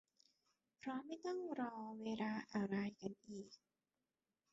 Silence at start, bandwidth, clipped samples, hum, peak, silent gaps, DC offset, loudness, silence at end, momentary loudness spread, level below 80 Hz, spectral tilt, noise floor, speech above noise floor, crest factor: 0.85 s; 8 kHz; under 0.1%; none; -30 dBFS; none; under 0.1%; -46 LUFS; 0.95 s; 12 LU; -84 dBFS; -5.5 dB/octave; under -90 dBFS; over 44 dB; 18 dB